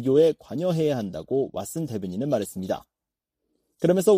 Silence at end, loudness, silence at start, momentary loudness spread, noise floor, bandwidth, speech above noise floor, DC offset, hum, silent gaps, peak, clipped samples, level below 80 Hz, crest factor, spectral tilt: 0 s; -26 LUFS; 0 s; 10 LU; -87 dBFS; 15.5 kHz; 64 dB; under 0.1%; none; none; -8 dBFS; under 0.1%; -62 dBFS; 16 dB; -6.5 dB/octave